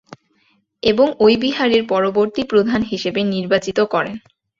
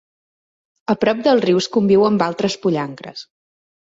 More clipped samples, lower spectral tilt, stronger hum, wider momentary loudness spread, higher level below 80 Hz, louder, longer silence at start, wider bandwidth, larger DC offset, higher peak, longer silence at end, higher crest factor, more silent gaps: neither; about the same, -5.5 dB/octave vs -6 dB/octave; neither; second, 7 LU vs 18 LU; first, -52 dBFS vs -58 dBFS; about the same, -17 LUFS vs -17 LUFS; about the same, 0.85 s vs 0.9 s; about the same, 7.6 kHz vs 7.8 kHz; neither; about the same, 0 dBFS vs -2 dBFS; second, 0.4 s vs 0.75 s; about the same, 16 dB vs 16 dB; neither